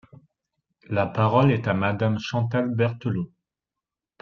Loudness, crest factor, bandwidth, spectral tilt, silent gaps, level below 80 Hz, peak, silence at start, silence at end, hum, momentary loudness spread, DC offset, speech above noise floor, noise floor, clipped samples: -24 LUFS; 20 dB; 7 kHz; -8 dB/octave; none; -60 dBFS; -4 dBFS; 0.9 s; 0.95 s; none; 9 LU; under 0.1%; 66 dB; -88 dBFS; under 0.1%